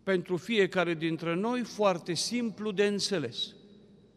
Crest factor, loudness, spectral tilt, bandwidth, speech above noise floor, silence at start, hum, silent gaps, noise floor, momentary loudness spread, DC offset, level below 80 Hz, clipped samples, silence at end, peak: 18 dB; -30 LUFS; -4.5 dB/octave; 14 kHz; 27 dB; 0.05 s; none; none; -56 dBFS; 5 LU; under 0.1%; -72 dBFS; under 0.1%; 0.5 s; -14 dBFS